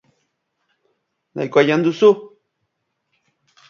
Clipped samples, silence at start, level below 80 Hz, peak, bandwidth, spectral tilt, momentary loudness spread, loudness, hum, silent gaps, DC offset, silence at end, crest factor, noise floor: under 0.1%; 1.35 s; -70 dBFS; 0 dBFS; 7 kHz; -6.5 dB/octave; 13 LU; -16 LUFS; none; none; under 0.1%; 1.45 s; 20 dB; -74 dBFS